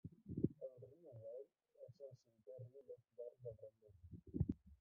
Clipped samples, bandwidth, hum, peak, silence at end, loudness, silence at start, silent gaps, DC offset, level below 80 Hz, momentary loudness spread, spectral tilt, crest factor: under 0.1%; 2.3 kHz; none; -22 dBFS; 0.05 s; -51 LUFS; 0.05 s; none; under 0.1%; -66 dBFS; 18 LU; -15 dB/octave; 28 dB